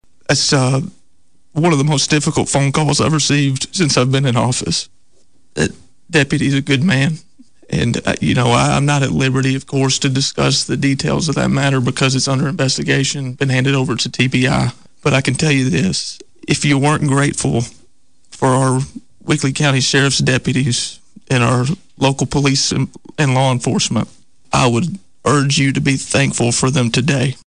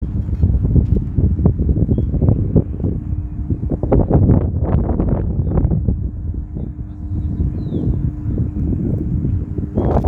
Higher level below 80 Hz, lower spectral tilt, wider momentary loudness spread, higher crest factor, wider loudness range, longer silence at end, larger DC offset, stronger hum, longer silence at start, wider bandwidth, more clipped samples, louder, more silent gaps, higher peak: second, -42 dBFS vs -22 dBFS; second, -4.5 dB/octave vs -13 dB/octave; second, 7 LU vs 10 LU; about the same, 12 dB vs 16 dB; about the same, 2 LU vs 4 LU; about the same, 0.1 s vs 0 s; first, 0.7% vs under 0.1%; neither; first, 0.3 s vs 0 s; first, 10.5 kHz vs 2.6 kHz; neither; first, -15 LUFS vs -19 LUFS; neither; second, -4 dBFS vs 0 dBFS